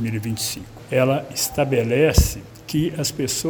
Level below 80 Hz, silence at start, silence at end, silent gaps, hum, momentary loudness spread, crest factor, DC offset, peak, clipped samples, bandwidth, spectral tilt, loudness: -32 dBFS; 0 s; 0 s; none; none; 9 LU; 20 dB; under 0.1%; -2 dBFS; under 0.1%; over 20 kHz; -4.5 dB/octave; -21 LUFS